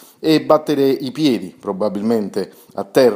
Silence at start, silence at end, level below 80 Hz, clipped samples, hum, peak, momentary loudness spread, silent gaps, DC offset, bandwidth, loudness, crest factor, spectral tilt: 0.2 s; 0 s; -66 dBFS; under 0.1%; none; 0 dBFS; 12 LU; none; under 0.1%; 16 kHz; -18 LUFS; 18 dB; -6 dB/octave